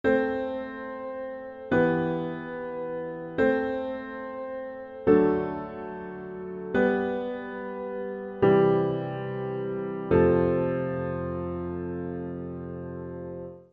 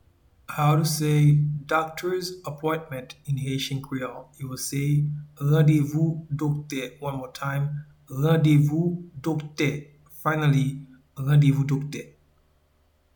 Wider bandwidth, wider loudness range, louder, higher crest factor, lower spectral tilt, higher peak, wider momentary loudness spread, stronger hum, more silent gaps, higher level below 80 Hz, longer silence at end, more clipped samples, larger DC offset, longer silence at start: second, 5 kHz vs 19 kHz; about the same, 5 LU vs 4 LU; second, -28 LUFS vs -25 LUFS; about the same, 20 dB vs 16 dB; first, -9.5 dB/octave vs -6.5 dB/octave; about the same, -8 dBFS vs -8 dBFS; about the same, 15 LU vs 16 LU; neither; neither; about the same, -56 dBFS vs -56 dBFS; second, 0.1 s vs 1.1 s; neither; neither; second, 0.05 s vs 0.5 s